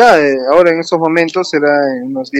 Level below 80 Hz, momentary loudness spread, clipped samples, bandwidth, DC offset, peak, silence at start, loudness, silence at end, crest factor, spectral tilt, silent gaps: -50 dBFS; 5 LU; 0.5%; 12.5 kHz; under 0.1%; 0 dBFS; 0 s; -11 LUFS; 0 s; 10 dB; -5 dB/octave; none